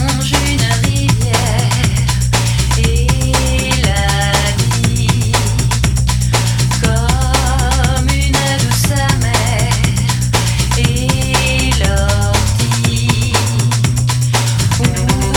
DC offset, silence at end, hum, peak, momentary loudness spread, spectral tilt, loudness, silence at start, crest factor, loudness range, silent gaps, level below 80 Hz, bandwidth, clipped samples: under 0.1%; 0 s; none; 0 dBFS; 1 LU; -4 dB/octave; -13 LUFS; 0 s; 12 dB; 0 LU; none; -20 dBFS; 18 kHz; under 0.1%